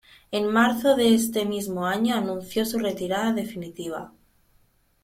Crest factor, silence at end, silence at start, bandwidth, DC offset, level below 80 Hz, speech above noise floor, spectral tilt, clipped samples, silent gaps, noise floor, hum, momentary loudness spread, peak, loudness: 18 dB; 0.95 s; 0.3 s; 16.5 kHz; under 0.1%; -60 dBFS; 39 dB; -4.5 dB/octave; under 0.1%; none; -63 dBFS; none; 14 LU; -8 dBFS; -24 LUFS